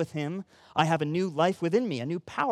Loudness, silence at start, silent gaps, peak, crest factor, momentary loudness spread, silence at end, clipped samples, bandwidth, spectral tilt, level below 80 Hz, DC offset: -28 LUFS; 0 s; none; -8 dBFS; 20 dB; 8 LU; 0 s; under 0.1%; 13 kHz; -6.5 dB/octave; -70 dBFS; under 0.1%